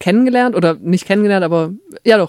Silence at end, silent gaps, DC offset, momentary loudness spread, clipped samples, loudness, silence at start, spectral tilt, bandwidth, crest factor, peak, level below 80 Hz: 0 s; none; under 0.1%; 6 LU; under 0.1%; -14 LUFS; 0 s; -6.5 dB/octave; 13.5 kHz; 14 dB; 0 dBFS; -62 dBFS